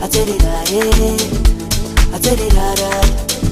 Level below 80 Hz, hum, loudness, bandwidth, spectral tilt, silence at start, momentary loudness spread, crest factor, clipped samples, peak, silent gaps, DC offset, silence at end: -14 dBFS; none; -15 LUFS; 15.5 kHz; -4 dB/octave; 0 s; 3 LU; 12 dB; under 0.1%; 0 dBFS; none; under 0.1%; 0 s